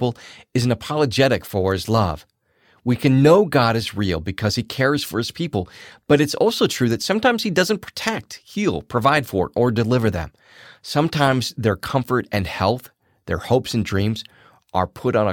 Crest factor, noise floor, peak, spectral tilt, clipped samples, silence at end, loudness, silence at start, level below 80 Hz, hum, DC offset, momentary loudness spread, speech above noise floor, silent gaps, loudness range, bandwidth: 16 dB; -59 dBFS; -4 dBFS; -5.5 dB/octave; under 0.1%; 0 s; -20 LUFS; 0 s; -46 dBFS; none; under 0.1%; 10 LU; 40 dB; none; 4 LU; 18 kHz